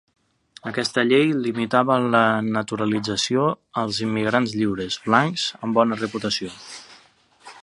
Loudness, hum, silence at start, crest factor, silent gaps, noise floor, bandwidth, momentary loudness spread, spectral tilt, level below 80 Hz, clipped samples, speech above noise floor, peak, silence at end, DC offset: -21 LUFS; none; 0.65 s; 22 dB; none; -55 dBFS; 11.5 kHz; 9 LU; -4.5 dB/octave; -60 dBFS; under 0.1%; 34 dB; 0 dBFS; 0.05 s; under 0.1%